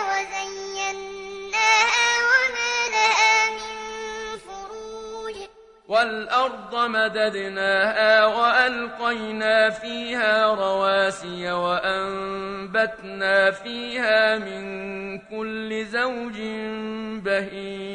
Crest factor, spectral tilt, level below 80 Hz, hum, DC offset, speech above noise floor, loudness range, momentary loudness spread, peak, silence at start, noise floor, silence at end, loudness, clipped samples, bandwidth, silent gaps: 18 dB; -2 dB/octave; -58 dBFS; none; under 0.1%; 20 dB; 7 LU; 16 LU; -4 dBFS; 0 s; -43 dBFS; 0 s; -22 LUFS; under 0.1%; 11 kHz; none